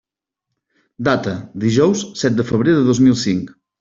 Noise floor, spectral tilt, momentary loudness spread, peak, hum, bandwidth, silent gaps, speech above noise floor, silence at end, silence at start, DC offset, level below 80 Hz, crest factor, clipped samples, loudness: -81 dBFS; -6 dB/octave; 9 LU; -2 dBFS; none; 7.8 kHz; none; 65 dB; 0.3 s; 1 s; under 0.1%; -52 dBFS; 16 dB; under 0.1%; -17 LUFS